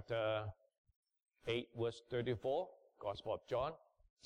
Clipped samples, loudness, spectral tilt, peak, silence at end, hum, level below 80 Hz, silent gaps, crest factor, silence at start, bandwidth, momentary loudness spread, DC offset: under 0.1%; -42 LUFS; -6.5 dB/octave; -28 dBFS; 0.5 s; none; -68 dBFS; 0.78-0.85 s, 0.96-1.03 s; 14 dB; 0 s; 10.5 kHz; 11 LU; under 0.1%